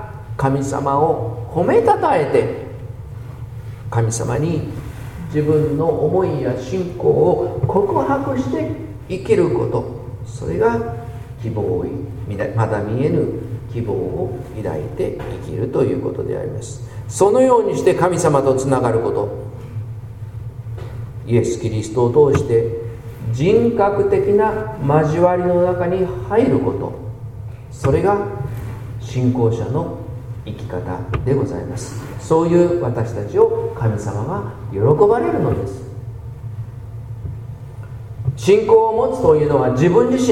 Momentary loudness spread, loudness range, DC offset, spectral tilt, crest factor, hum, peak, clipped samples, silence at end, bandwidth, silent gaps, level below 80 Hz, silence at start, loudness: 17 LU; 6 LU; under 0.1%; -7.5 dB/octave; 18 dB; none; 0 dBFS; under 0.1%; 0 s; 14 kHz; none; -40 dBFS; 0 s; -18 LUFS